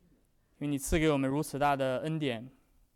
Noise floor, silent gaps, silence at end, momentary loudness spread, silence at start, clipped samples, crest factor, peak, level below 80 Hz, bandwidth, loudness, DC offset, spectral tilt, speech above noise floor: -68 dBFS; none; 0.45 s; 8 LU; 0.6 s; under 0.1%; 14 dB; -18 dBFS; -48 dBFS; 17 kHz; -31 LUFS; under 0.1%; -5.5 dB/octave; 37 dB